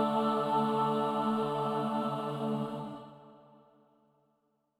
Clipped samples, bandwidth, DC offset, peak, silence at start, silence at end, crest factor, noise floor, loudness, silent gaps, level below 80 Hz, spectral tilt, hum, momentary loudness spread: under 0.1%; 13.5 kHz; under 0.1%; -18 dBFS; 0 s; 1.45 s; 14 dB; -76 dBFS; -32 LUFS; none; -70 dBFS; -7 dB/octave; none; 12 LU